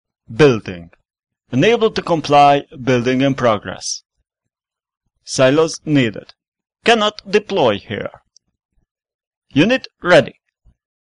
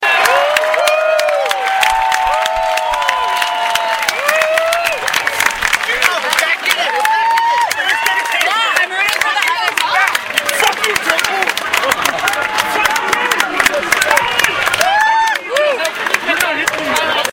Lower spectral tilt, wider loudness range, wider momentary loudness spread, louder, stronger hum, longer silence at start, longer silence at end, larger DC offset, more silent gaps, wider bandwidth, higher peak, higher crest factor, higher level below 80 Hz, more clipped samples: first, -5 dB/octave vs 0 dB/octave; first, 4 LU vs 1 LU; first, 14 LU vs 3 LU; second, -16 LUFS vs -13 LUFS; neither; first, 0.3 s vs 0 s; first, 0.8 s vs 0 s; neither; first, 6.48-6.52 s, 8.65-8.69 s, 8.91-8.95 s, 9.14-9.19 s, 9.27-9.31 s, 9.37-9.42 s vs none; second, 10.5 kHz vs over 20 kHz; about the same, 0 dBFS vs 0 dBFS; about the same, 16 dB vs 14 dB; about the same, -50 dBFS vs -46 dBFS; neither